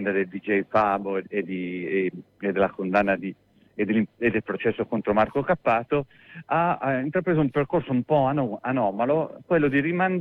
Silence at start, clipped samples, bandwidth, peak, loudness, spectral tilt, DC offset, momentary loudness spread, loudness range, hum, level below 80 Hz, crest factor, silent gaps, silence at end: 0 s; under 0.1%; 6 kHz; -10 dBFS; -25 LUFS; -9.5 dB/octave; under 0.1%; 7 LU; 2 LU; none; -56 dBFS; 16 dB; none; 0 s